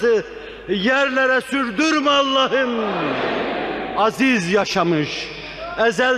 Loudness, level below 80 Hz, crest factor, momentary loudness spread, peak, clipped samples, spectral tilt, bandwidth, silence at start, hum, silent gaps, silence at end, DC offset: -19 LUFS; -50 dBFS; 14 dB; 10 LU; -6 dBFS; under 0.1%; -4 dB/octave; 13.5 kHz; 0 s; none; none; 0 s; under 0.1%